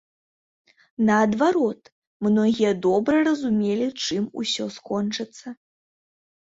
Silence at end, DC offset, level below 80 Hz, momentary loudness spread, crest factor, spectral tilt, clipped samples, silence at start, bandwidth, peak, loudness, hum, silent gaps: 1.05 s; under 0.1%; -62 dBFS; 13 LU; 16 dB; -5 dB/octave; under 0.1%; 1 s; 8 kHz; -8 dBFS; -22 LUFS; none; 1.92-2.20 s